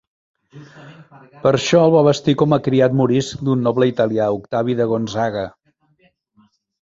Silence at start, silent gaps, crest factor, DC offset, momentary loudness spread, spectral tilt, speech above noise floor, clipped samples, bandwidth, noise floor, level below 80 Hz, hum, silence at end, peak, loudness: 0.55 s; none; 18 dB; under 0.1%; 8 LU; -6.5 dB/octave; 43 dB; under 0.1%; 8 kHz; -60 dBFS; -54 dBFS; none; 1.35 s; 0 dBFS; -17 LUFS